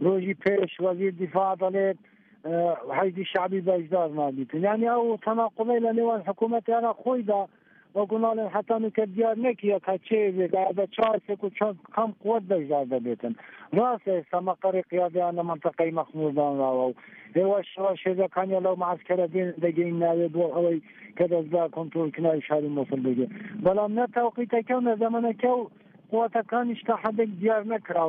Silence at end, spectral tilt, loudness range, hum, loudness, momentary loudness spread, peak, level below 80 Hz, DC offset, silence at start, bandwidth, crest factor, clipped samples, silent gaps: 0 s; -6 dB/octave; 2 LU; none; -26 LUFS; 5 LU; -10 dBFS; -74 dBFS; under 0.1%; 0 s; 4.6 kHz; 16 dB; under 0.1%; none